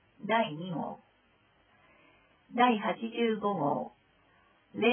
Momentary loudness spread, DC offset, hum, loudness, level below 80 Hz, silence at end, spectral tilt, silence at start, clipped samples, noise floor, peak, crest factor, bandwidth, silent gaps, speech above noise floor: 16 LU; under 0.1%; none; -31 LUFS; -78 dBFS; 0 s; -9 dB/octave; 0.2 s; under 0.1%; -67 dBFS; -12 dBFS; 22 dB; 3.5 kHz; none; 37 dB